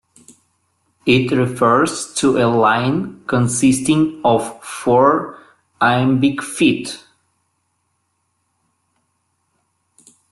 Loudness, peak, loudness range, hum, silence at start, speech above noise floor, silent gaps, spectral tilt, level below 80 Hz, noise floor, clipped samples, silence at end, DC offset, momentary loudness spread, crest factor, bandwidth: -16 LUFS; -2 dBFS; 6 LU; none; 1.05 s; 53 dB; none; -5 dB/octave; -54 dBFS; -69 dBFS; under 0.1%; 3.35 s; under 0.1%; 10 LU; 16 dB; 12.5 kHz